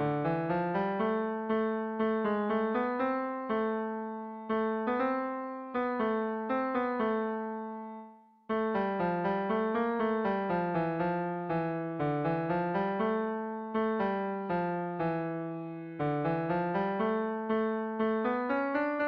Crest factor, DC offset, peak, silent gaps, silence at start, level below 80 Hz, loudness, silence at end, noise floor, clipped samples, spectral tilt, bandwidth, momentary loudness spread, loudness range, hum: 14 dB; under 0.1%; -18 dBFS; none; 0 s; -66 dBFS; -32 LUFS; 0 s; -53 dBFS; under 0.1%; -9.5 dB/octave; 5.2 kHz; 6 LU; 2 LU; none